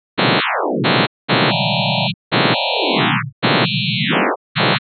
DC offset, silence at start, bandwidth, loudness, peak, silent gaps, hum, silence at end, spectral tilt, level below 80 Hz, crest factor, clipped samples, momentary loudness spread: under 0.1%; 0.15 s; 4.5 kHz; -16 LUFS; -2 dBFS; 1.07-1.28 s, 2.14-2.31 s, 3.32-3.42 s, 4.36-4.55 s; none; 0.2 s; -10.5 dB/octave; -70 dBFS; 16 dB; under 0.1%; 3 LU